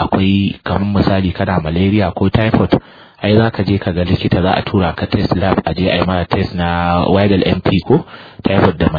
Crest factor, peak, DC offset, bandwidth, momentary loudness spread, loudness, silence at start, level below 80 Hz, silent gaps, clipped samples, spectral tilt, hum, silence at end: 14 dB; 0 dBFS; under 0.1%; 5 kHz; 4 LU; -14 LUFS; 0 s; -34 dBFS; none; under 0.1%; -9.5 dB/octave; none; 0 s